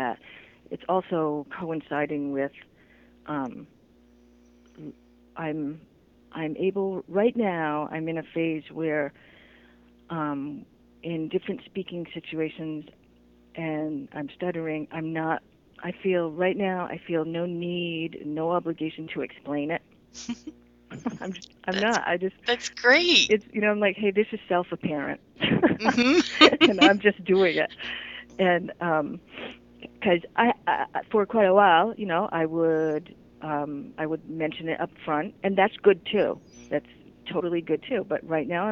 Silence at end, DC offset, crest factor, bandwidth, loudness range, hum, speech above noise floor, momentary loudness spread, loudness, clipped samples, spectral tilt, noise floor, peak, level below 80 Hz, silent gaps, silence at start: 0 s; under 0.1%; 26 dB; 8 kHz; 13 LU; none; 32 dB; 17 LU; -26 LUFS; under 0.1%; -5 dB/octave; -57 dBFS; 0 dBFS; -62 dBFS; none; 0 s